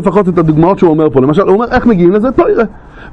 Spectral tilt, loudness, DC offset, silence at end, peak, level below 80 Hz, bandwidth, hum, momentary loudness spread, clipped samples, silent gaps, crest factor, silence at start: -9.5 dB/octave; -9 LUFS; under 0.1%; 0 s; 0 dBFS; -32 dBFS; 8.4 kHz; none; 2 LU; 0.4%; none; 8 dB; 0 s